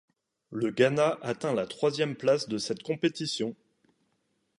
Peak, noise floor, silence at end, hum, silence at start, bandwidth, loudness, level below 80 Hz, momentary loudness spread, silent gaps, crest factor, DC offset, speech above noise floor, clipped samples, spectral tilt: -10 dBFS; -75 dBFS; 1.05 s; none; 0.5 s; 11.5 kHz; -29 LUFS; -72 dBFS; 8 LU; none; 20 dB; under 0.1%; 47 dB; under 0.1%; -5 dB/octave